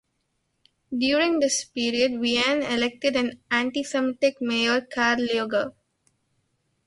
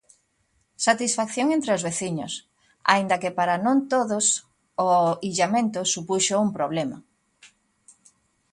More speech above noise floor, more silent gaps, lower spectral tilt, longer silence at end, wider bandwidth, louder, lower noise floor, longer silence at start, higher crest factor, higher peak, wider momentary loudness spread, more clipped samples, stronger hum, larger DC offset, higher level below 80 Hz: first, 51 dB vs 46 dB; neither; about the same, -2 dB/octave vs -3 dB/octave; about the same, 1.15 s vs 1.05 s; about the same, 11.5 kHz vs 11.5 kHz; about the same, -24 LUFS vs -23 LUFS; first, -74 dBFS vs -69 dBFS; about the same, 0.9 s vs 0.8 s; second, 18 dB vs 24 dB; second, -6 dBFS vs -2 dBFS; second, 5 LU vs 8 LU; neither; neither; neither; about the same, -64 dBFS vs -68 dBFS